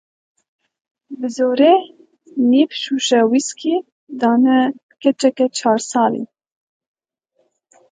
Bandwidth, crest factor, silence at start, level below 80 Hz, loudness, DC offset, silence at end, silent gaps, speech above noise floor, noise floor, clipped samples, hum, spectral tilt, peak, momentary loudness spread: 9.4 kHz; 18 dB; 1.1 s; -74 dBFS; -17 LUFS; under 0.1%; 1.65 s; 3.92-4.07 s, 4.83-4.89 s; 51 dB; -67 dBFS; under 0.1%; none; -3.5 dB/octave; 0 dBFS; 14 LU